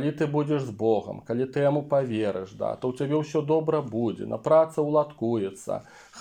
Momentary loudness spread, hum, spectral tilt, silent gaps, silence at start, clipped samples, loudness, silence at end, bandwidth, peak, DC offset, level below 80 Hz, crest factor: 9 LU; none; -7.5 dB/octave; none; 0 s; under 0.1%; -26 LUFS; 0 s; 10.5 kHz; -8 dBFS; under 0.1%; -66 dBFS; 18 dB